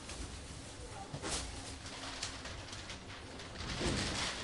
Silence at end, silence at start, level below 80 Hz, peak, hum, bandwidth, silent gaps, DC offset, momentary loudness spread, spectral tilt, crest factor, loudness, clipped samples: 0 s; 0 s; -50 dBFS; -22 dBFS; none; 11.5 kHz; none; under 0.1%; 12 LU; -3 dB/octave; 20 dB; -42 LUFS; under 0.1%